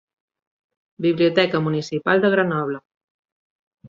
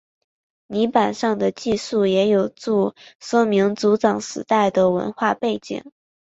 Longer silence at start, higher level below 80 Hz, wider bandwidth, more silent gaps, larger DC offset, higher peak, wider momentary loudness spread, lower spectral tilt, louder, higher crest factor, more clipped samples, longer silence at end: first, 1 s vs 0.7 s; about the same, -64 dBFS vs -60 dBFS; about the same, 7.6 kHz vs 8 kHz; first, 2.85-2.90 s, 2.97-3.23 s, 3.32-3.71 s vs 3.15-3.19 s; neither; about the same, -2 dBFS vs -4 dBFS; about the same, 8 LU vs 9 LU; about the same, -6.5 dB/octave vs -5.5 dB/octave; about the same, -20 LUFS vs -20 LUFS; about the same, 20 dB vs 18 dB; neither; second, 0 s vs 0.5 s